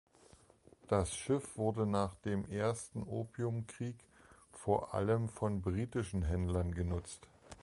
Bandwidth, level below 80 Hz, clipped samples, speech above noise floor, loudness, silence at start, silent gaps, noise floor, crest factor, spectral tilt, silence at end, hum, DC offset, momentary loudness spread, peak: 11.5 kHz; -50 dBFS; under 0.1%; 28 dB; -37 LUFS; 0.9 s; none; -64 dBFS; 20 dB; -6.5 dB/octave; 0 s; none; under 0.1%; 10 LU; -18 dBFS